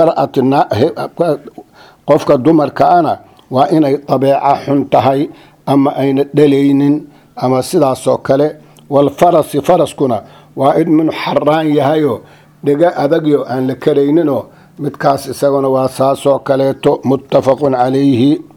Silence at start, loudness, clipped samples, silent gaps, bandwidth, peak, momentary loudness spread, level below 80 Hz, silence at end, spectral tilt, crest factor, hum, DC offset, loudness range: 0 s; -12 LUFS; 0.1%; none; 16.5 kHz; 0 dBFS; 7 LU; -52 dBFS; 0.15 s; -7 dB/octave; 12 dB; none; under 0.1%; 2 LU